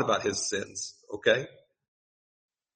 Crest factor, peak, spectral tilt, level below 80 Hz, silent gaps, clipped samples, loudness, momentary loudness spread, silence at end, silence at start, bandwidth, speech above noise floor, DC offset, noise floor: 22 dB; -10 dBFS; -2.5 dB/octave; -70 dBFS; none; under 0.1%; -29 LUFS; 12 LU; 1.25 s; 0 s; 8.8 kHz; over 61 dB; under 0.1%; under -90 dBFS